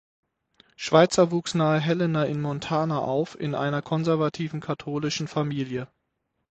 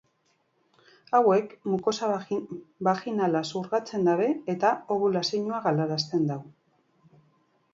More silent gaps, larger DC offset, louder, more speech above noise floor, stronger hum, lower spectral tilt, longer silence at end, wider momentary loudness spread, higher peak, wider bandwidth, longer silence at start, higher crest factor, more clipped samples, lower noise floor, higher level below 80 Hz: neither; neither; about the same, -25 LUFS vs -27 LUFS; first, 53 dB vs 45 dB; neither; about the same, -6 dB/octave vs -6 dB/octave; second, 0.65 s vs 1.25 s; first, 11 LU vs 7 LU; first, -4 dBFS vs -8 dBFS; first, 8.8 kHz vs 7.8 kHz; second, 0.8 s vs 1.1 s; about the same, 22 dB vs 18 dB; neither; first, -77 dBFS vs -71 dBFS; first, -62 dBFS vs -74 dBFS